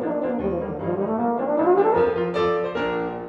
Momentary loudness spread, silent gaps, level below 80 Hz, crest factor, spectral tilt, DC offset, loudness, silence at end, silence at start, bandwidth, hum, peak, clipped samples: 8 LU; none; -50 dBFS; 14 dB; -8.5 dB/octave; under 0.1%; -22 LUFS; 0 s; 0 s; 7 kHz; none; -8 dBFS; under 0.1%